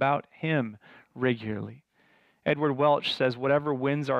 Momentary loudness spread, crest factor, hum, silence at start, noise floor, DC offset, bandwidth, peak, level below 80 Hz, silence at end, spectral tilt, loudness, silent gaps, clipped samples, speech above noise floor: 11 LU; 16 dB; none; 0 s; -64 dBFS; under 0.1%; 9.8 kHz; -12 dBFS; -70 dBFS; 0 s; -7 dB/octave; -28 LUFS; none; under 0.1%; 37 dB